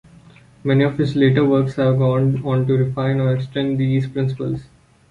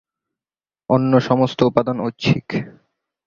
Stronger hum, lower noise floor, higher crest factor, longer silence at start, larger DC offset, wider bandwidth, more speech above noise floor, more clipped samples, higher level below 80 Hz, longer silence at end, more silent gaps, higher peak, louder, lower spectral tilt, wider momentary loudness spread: neither; second, -46 dBFS vs under -90 dBFS; about the same, 16 dB vs 18 dB; second, 0.65 s vs 0.9 s; neither; about the same, 7 kHz vs 7.2 kHz; second, 29 dB vs over 72 dB; neither; about the same, -50 dBFS vs -52 dBFS; about the same, 0.45 s vs 0.55 s; neither; about the same, -2 dBFS vs -2 dBFS; about the same, -18 LUFS vs -18 LUFS; first, -9 dB/octave vs -7.5 dB/octave; second, 7 LU vs 11 LU